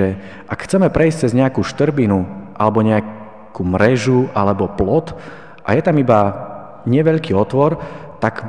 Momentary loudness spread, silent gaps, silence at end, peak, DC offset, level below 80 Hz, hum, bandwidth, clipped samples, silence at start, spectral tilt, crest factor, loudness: 16 LU; none; 0 s; 0 dBFS; 0.8%; -42 dBFS; none; 10 kHz; under 0.1%; 0 s; -7.5 dB/octave; 16 dB; -16 LUFS